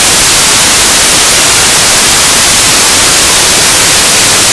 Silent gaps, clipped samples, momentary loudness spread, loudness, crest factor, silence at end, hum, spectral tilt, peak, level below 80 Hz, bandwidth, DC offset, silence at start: none; 3%; 0 LU; -2 LUFS; 6 dB; 0 s; none; 0 dB/octave; 0 dBFS; -28 dBFS; 11 kHz; under 0.1%; 0 s